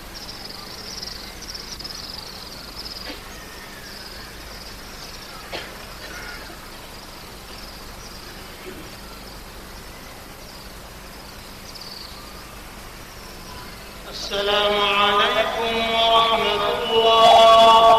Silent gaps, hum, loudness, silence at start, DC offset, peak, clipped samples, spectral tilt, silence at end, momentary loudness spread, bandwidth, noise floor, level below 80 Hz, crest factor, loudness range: none; none; -18 LUFS; 0 s; under 0.1%; -6 dBFS; under 0.1%; -2.5 dB/octave; 0 s; 22 LU; 15 kHz; -39 dBFS; -44 dBFS; 16 dB; 19 LU